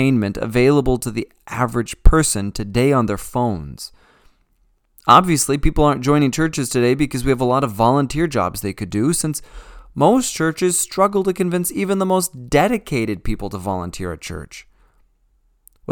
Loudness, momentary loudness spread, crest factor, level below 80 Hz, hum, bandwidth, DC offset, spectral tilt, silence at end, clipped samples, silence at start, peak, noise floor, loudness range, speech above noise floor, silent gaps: -18 LUFS; 13 LU; 18 dB; -28 dBFS; none; 19 kHz; under 0.1%; -5 dB/octave; 0 s; under 0.1%; 0 s; 0 dBFS; -61 dBFS; 4 LU; 43 dB; none